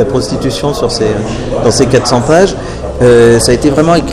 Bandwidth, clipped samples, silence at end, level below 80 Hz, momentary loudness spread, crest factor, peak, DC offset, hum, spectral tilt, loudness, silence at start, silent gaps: 14.5 kHz; 1%; 0 s; -26 dBFS; 9 LU; 8 dB; 0 dBFS; under 0.1%; none; -5 dB/octave; -9 LUFS; 0 s; none